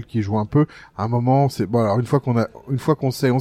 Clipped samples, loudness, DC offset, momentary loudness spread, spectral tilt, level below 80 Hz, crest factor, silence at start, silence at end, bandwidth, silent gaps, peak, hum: under 0.1%; -20 LUFS; under 0.1%; 6 LU; -8 dB/octave; -52 dBFS; 14 dB; 0 s; 0 s; 15.5 kHz; none; -4 dBFS; none